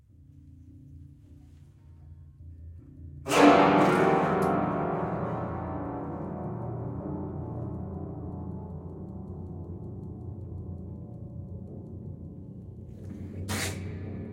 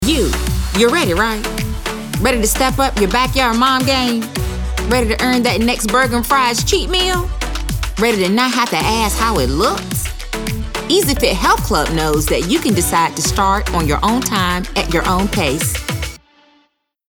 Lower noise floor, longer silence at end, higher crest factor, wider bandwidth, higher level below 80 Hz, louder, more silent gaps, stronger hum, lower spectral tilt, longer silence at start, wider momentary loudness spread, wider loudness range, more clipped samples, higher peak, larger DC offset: second, -53 dBFS vs -60 dBFS; second, 0 s vs 0.95 s; first, 24 dB vs 14 dB; second, 16 kHz vs over 20 kHz; second, -54 dBFS vs -24 dBFS; second, -29 LUFS vs -15 LUFS; neither; neither; first, -6 dB/octave vs -4 dB/octave; first, 0.2 s vs 0 s; first, 23 LU vs 8 LU; first, 17 LU vs 1 LU; neither; second, -6 dBFS vs 0 dBFS; neither